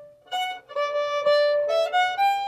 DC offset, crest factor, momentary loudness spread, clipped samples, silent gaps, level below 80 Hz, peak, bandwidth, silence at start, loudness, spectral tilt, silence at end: under 0.1%; 12 dB; 8 LU; under 0.1%; none; -74 dBFS; -12 dBFS; 15 kHz; 0 s; -23 LUFS; 0 dB/octave; 0 s